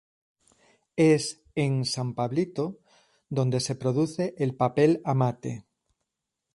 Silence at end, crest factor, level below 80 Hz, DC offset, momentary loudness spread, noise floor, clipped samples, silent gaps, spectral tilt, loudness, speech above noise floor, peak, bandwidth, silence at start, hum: 0.95 s; 18 dB; -66 dBFS; under 0.1%; 12 LU; -85 dBFS; under 0.1%; none; -6 dB/octave; -27 LUFS; 59 dB; -8 dBFS; 11.5 kHz; 0.95 s; none